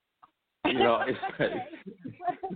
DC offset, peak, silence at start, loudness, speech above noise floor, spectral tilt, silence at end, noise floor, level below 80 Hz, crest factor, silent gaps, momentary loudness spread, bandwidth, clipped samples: under 0.1%; -12 dBFS; 0.65 s; -29 LUFS; 34 dB; -9 dB/octave; 0 s; -64 dBFS; -64 dBFS; 20 dB; none; 19 LU; 4.7 kHz; under 0.1%